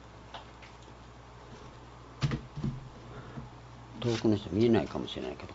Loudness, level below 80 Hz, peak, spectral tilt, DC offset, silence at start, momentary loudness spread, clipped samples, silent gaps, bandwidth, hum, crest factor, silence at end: -32 LUFS; -54 dBFS; -12 dBFS; -7 dB/octave; under 0.1%; 0 s; 23 LU; under 0.1%; none; 8 kHz; none; 22 dB; 0 s